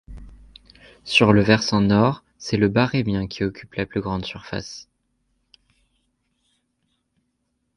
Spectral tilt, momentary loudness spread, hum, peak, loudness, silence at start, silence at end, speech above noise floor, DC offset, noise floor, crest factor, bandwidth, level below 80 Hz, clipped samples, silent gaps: -6 dB/octave; 16 LU; none; 0 dBFS; -21 LUFS; 0.1 s; 2.95 s; 53 dB; under 0.1%; -73 dBFS; 22 dB; 11 kHz; -46 dBFS; under 0.1%; none